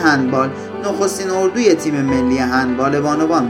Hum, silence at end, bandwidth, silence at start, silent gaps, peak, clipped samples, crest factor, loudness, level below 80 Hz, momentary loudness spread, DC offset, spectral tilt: none; 0 s; 15.5 kHz; 0 s; none; 0 dBFS; under 0.1%; 16 dB; -16 LUFS; -44 dBFS; 4 LU; under 0.1%; -5 dB/octave